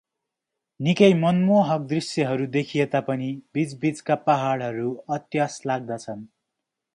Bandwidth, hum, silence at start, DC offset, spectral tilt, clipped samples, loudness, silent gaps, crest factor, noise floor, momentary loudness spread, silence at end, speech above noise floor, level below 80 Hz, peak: 11 kHz; none; 0.8 s; under 0.1%; -6.5 dB/octave; under 0.1%; -23 LUFS; none; 20 dB; -84 dBFS; 11 LU; 0.7 s; 62 dB; -68 dBFS; -4 dBFS